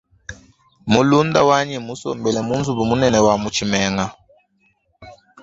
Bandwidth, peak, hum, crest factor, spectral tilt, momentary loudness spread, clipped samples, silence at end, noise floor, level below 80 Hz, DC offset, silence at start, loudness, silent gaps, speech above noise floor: 8 kHz; 0 dBFS; none; 18 dB; -5 dB/octave; 14 LU; under 0.1%; 0.3 s; -63 dBFS; -46 dBFS; under 0.1%; 0.3 s; -18 LUFS; none; 46 dB